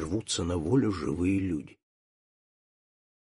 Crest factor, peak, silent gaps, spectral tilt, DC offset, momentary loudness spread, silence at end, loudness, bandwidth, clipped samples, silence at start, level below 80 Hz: 16 dB; -14 dBFS; none; -5.5 dB/octave; under 0.1%; 6 LU; 1.55 s; -29 LUFS; 11.5 kHz; under 0.1%; 0 s; -52 dBFS